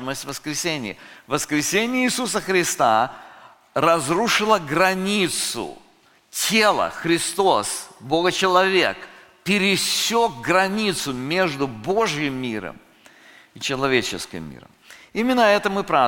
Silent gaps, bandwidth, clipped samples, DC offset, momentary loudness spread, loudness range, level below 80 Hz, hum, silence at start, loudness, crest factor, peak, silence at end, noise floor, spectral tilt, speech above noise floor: none; 17 kHz; under 0.1%; under 0.1%; 13 LU; 5 LU; -54 dBFS; none; 0 s; -20 LUFS; 20 dB; -2 dBFS; 0 s; -56 dBFS; -3 dB/octave; 35 dB